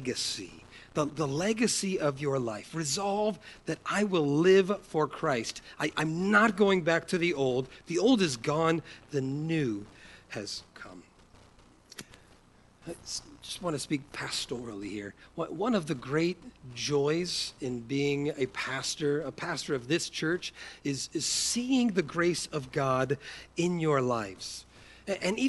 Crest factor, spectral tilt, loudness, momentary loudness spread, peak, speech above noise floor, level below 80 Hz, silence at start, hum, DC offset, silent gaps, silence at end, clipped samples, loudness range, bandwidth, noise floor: 20 dB; -4.5 dB/octave; -30 LUFS; 15 LU; -10 dBFS; 30 dB; -62 dBFS; 0 s; none; under 0.1%; none; 0 s; under 0.1%; 11 LU; 11.5 kHz; -60 dBFS